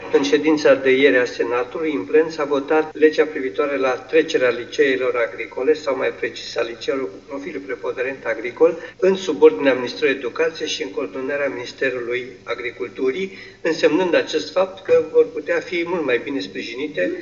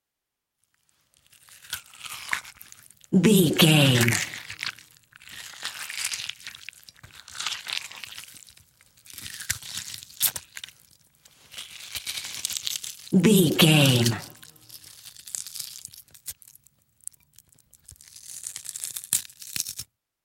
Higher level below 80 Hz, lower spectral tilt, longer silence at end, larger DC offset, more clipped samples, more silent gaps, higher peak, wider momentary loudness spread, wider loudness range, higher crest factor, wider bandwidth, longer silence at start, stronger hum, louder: about the same, -60 dBFS vs -64 dBFS; about the same, -4.5 dB/octave vs -4 dB/octave; second, 0 s vs 0.4 s; neither; neither; neither; about the same, 0 dBFS vs 0 dBFS; second, 11 LU vs 25 LU; second, 5 LU vs 16 LU; second, 20 dB vs 26 dB; second, 7.2 kHz vs 17 kHz; second, 0 s vs 1.7 s; neither; first, -20 LUFS vs -24 LUFS